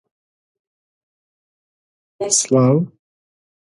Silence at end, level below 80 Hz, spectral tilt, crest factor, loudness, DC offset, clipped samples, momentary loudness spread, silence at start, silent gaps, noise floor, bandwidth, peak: 0.9 s; -64 dBFS; -5 dB/octave; 20 dB; -16 LUFS; under 0.1%; under 0.1%; 14 LU; 2.2 s; none; under -90 dBFS; 11.5 kHz; -2 dBFS